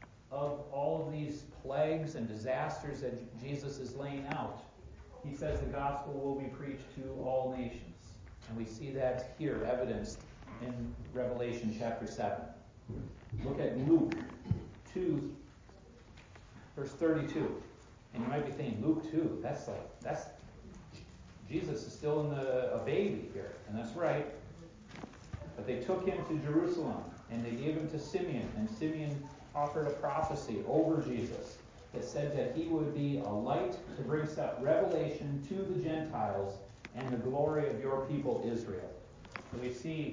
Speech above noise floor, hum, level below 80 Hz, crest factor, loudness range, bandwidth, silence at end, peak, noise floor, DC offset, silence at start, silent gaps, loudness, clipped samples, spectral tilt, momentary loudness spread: 21 dB; none; -56 dBFS; 20 dB; 5 LU; 7.6 kHz; 0 s; -18 dBFS; -57 dBFS; under 0.1%; 0 s; none; -37 LUFS; under 0.1%; -7.5 dB/octave; 17 LU